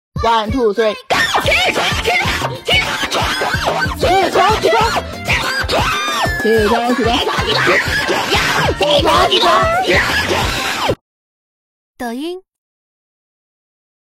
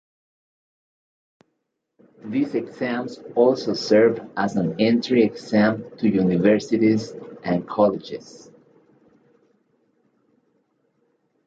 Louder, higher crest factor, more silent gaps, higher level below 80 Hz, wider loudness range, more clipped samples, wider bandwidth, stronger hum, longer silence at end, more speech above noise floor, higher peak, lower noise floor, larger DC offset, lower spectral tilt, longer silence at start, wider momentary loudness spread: first, -14 LUFS vs -21 LUFS; about the same, 16 dB vs 20 dB; first, 11.01-11.94 s vs none; first, -32 dBFS vs -62 dBFS; second, 6 LU vs 9 LU; neither; first, 16.5 kHz vs 7.8 kHz; neither; second, 1.7 s vs 3.1 s; first, over 76 dB vs 56 dB; first, 0 dBFS vs -4 dBFS; first, under -90 dBFS vs -77 dBFS; neither; second, -3.5 dB/octave vs -7 dB/octave; second, 0.15 s vs 2.25 s; second, 6 LU vs 11 LU